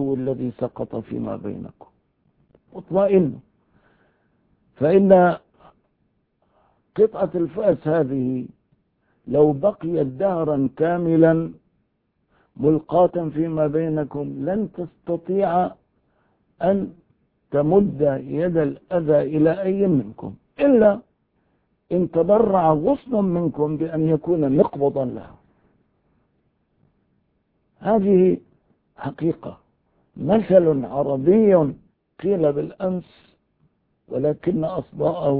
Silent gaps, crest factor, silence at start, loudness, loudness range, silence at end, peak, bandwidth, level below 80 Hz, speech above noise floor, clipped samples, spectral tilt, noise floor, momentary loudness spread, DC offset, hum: none; 20 dB; 0 s; -20 LUFS; 5 LU; 0 s; 0 dBFS; 4.5 kHz; -54 dBFS; 50 dB; under 0.1%; -13 dB/octave; -70 dBFS; 14 LU; under 0.1%; none